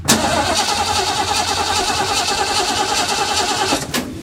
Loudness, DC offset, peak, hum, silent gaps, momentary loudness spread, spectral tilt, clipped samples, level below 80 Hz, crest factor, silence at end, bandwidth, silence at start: -16 LUFS; under 0.1%; 0 dBFS; none; none; 1 LU; -2 dB/octave; under 0.1%; -42 dBFS; 18 dB; 0 s; 16 kHz; 0 s